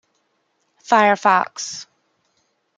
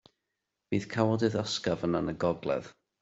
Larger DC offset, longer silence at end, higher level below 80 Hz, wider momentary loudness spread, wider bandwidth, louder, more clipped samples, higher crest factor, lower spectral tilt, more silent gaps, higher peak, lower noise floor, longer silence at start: neither; first, 0.95 s vs 0.3 s; second, -80 dBFS vs -62 dBFS; first, 15 LU vs 7 LU; first, 9.4 kHz vs 8 kHz; first, -17 LUFS vs -31 LUFS; neither; about the same, 20 dB vs 20 dB; second, -3 dB/octave vs -6 dB/octave; neither; first, -2 dBFS vs -10 dBFS; second, -68 dBFS vs -85 dBFS; first, 0.9 s vs 0.7 s